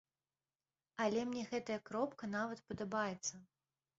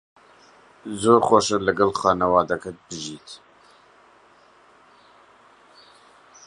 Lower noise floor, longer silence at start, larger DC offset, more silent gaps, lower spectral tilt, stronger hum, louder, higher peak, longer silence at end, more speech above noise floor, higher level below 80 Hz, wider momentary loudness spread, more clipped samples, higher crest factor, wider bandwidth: first, under -90 dBFS vs -54 dBFS; first, 1 s vs 0.85 s; neither; neither; about the same, -4 dB/octave vs -4.5 dB/octave; neither; second, -41 LUFS vs -20 LUFS; second, -24 dBFS vs -2 dBFS; second, 0.55 s vs 3.1 s; first, over 49 dB vs 34 dB; second, -76 dBFS vs -56 dBFS; second, 7 LU vs 24 LU; neither; about the same, 20 dB vs 22 dB; second, 7.6 kHz vs 11 kHz